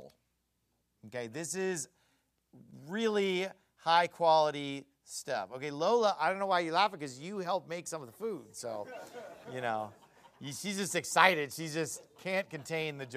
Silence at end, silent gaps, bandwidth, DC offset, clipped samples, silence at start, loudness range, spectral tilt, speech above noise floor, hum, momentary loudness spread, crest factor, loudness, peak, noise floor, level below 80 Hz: 0 s; none; 15 kHz; under 0.1%; under 0.1%; 0 s; 8 LU; -3.5 dB/octave; 46 dB; none; 17 LU; 28 dB; -33 LUFS; -6 dBFS; -79 dBFS; -82 dBFS